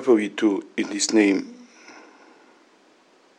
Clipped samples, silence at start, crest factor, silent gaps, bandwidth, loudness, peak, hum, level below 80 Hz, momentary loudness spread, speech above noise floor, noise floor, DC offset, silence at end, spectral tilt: under 0.1%; 0 s; 18 dB; none; 10.5 kHz; -22 LUFS; -6 dBFS; none; -86 dBFS; 9 LU; 36 dB; -57 dBFS; under 0.1%; 1.4 s; -3.5 dB/octave